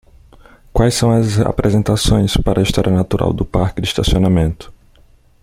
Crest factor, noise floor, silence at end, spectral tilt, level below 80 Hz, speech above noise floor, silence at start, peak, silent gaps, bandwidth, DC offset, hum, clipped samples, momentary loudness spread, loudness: 14 dB; -48 dBFS; 0.7 s; -6 dB/octave; -26 dBFS; 34 dB; 0.75 s; -2 dBFS; none; 16 kHz; under 0.1%; none; under 0.1%; 4 LU; -15 LUFS